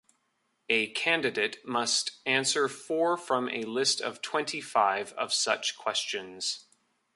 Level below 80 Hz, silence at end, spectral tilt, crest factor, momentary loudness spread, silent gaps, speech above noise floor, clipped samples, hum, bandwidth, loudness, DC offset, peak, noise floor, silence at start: -80 dBFS; 0.55 s; -1.5 dB/octave; 20 dB; 6 LU; none; 46 dB; under 0.1%; none; 11.5 kHz; -28 LUFS; under 0.1%; -10 dBFS; -76 dBFS; 0.7 s